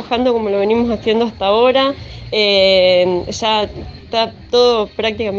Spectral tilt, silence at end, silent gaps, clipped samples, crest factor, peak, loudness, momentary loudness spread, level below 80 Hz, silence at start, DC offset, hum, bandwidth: -4.5 dB/octave; 0 s; none; under 0.1%; 14 dB; 0 dBFS; -14 LUFS; 9 LU; -40 dBFS; 0 s; under 0.1%; none; 7.6 kHz